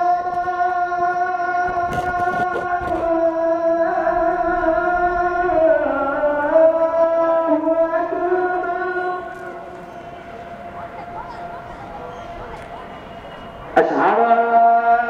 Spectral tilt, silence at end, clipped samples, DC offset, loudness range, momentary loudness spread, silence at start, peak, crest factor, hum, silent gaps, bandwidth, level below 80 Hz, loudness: -6.5 dB/octave; 0 s; under 0.1%; under 0.1%; 16 LU; 19 LU; 0 s; -2 dBFS; 18 dB; none; none; 6.8 kHz; -44 dBFS; -18 LUFS